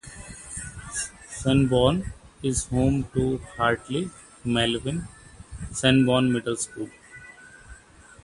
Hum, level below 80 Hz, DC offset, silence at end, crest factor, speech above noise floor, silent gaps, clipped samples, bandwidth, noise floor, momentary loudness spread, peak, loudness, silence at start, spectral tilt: none; -44 dBFS; under 0.1%; 0.5 s; 22 dB; 27 dB; none; under 0.1%; 11.5 kHz; -50 dBFS; 20 LU; -4 dBFS; -25 LUFS; 0.05 s; -5 dB/octave